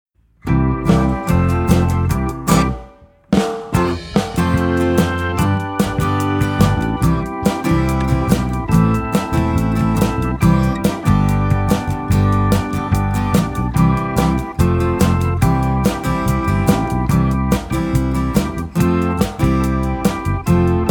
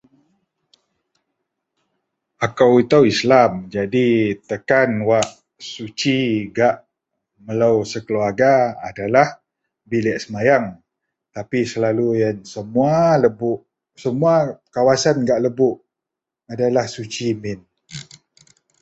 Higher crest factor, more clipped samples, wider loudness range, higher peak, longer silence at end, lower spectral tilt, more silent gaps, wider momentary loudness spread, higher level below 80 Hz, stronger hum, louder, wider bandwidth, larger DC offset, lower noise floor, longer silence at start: about the same, 16 dB vs 18 dB; neither; second, 1 LU vs 4 LU; about the same, 0 dBFS vs -2 dBFS; second, 0 s vs 0.8 s; first, -7 dB/octave vs -5.5 dB/octave; neither; second, 4 LU vs 16 LU; first, -26 dBFS vs -56 dBFS; neither; about the same, -17 LUFS vs -18 LUFS; first, over 20 kHz vs 8.2 kHz; neither; second, -42 dBFS vs -85 dBFS; second, 0.45 s vs 2.4 s